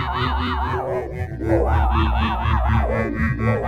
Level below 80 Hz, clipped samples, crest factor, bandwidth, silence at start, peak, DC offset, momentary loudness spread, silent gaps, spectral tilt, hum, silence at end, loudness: -26 dBFS; under 0.1%; 14 dB; 6.2 kHz; 0 s; -6 dBFS; under 0.1%; 6 LU; none; -8 dB/octave; none; 0 s; -21 LUFS